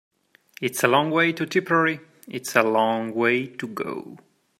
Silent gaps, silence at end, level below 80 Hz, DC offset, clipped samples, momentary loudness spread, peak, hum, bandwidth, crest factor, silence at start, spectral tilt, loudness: none; 0.45 s; -72 dBFS; under 0.1%; under 0.1%; 13 LU; 0 dBFS; none; 16 kHz; 24 dB; 0.6 s; -4.5 dB/octave; -22 LUFS